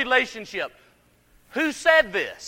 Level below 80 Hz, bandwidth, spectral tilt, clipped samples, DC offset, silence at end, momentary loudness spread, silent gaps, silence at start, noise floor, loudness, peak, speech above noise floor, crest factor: -58 dBFS; 16.5 kHz; -2.5 dB/octave; under 0.1%; under 0.1%; 0 s; 14 LU; none; 0 s; -59 dBFS; -22 LUFS; -2 dBFS; 36 dB; 22 dB